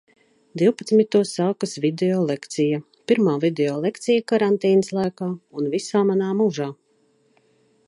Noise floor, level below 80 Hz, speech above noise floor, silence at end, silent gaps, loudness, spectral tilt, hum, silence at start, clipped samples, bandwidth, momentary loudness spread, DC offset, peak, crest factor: -63 dBFS; -72 dBFS; 42 dB; 1.15 s; none; -21 LUFS; -6 dB/octave; none; 0.55 s; under 0.1%; 11.5 kHz; 9 LU; under 0.1%; -4 dBFS; 16 dB